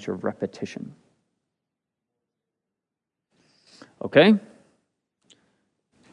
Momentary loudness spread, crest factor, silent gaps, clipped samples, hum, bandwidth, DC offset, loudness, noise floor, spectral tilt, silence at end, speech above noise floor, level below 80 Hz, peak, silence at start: 21 LU; 26 dB; none; under 0.1%; none; 10 kHz; under 0.1%; -22 LUFS; -86 dBFS; -6.5 dB/octave; 1.75 s; 65 dB; -78 dBFS; -2 dBFS; 0 s